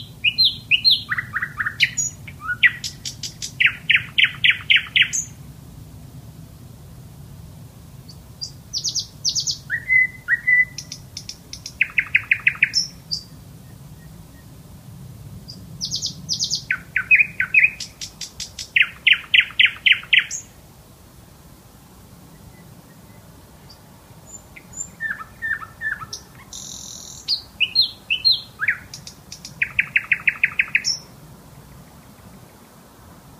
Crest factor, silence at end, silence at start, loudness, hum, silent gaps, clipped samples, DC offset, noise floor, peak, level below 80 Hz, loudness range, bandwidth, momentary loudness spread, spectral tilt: 22 dB; 0.25 s; 0 s; -18 LUFS; none; none; under 0.1%; under 0.1%; -46 dBFS; 0 dBFS; -50 dBFS; 13 LU; 15.5 kHz; 22 LU; 0 dB/octave